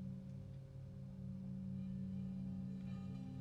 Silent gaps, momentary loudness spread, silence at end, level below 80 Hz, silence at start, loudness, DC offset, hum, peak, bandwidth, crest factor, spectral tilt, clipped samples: none; 7 LU; 0 s; -64 dBFS; 0 s; -49 LUFS; under 0.1%; none; -38 dBFS; 6 kHz; 10 dB; -9.5 dB/octave; under 0.1%